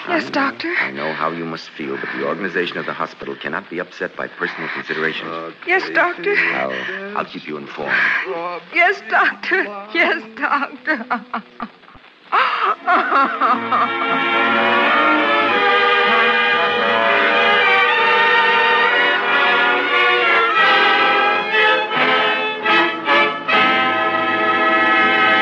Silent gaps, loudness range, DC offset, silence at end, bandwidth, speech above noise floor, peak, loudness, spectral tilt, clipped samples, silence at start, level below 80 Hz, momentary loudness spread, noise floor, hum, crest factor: none; 10 LU; under 0.1%; 0 s; 8.8 kHz; 24 dB; -4 dBFS; -15 LUFS; -4 dB/octave; under 0.1%; 0 s; -66 dBFS; 13 LU; -44 dBFS; none; 14 dB